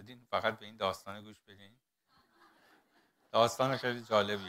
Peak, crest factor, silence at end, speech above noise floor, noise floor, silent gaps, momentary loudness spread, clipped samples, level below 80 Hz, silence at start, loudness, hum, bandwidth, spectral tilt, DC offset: -14 dBFS; 22 dB; 0 s; 37 dB; -72 dBFS; none; 17 LU; under 0.1%; -76 dBFS; 0 s; -33 LUFS; none; 16 kHz; -4 dB/octave; under 0.1%